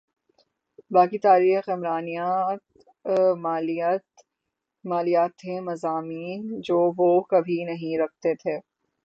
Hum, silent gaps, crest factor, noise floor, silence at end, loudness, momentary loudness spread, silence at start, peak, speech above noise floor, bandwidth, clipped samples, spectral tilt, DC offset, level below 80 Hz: none; none; 18 dB; -83 dBFS; 0.45 s; -24 LUFS; 13 LU; 0.9 s; -6 dBFS; 60 dB; 7.8 kHz; under 0.1%; -7.5 dB/octave; under 0.1%; -74 dBFS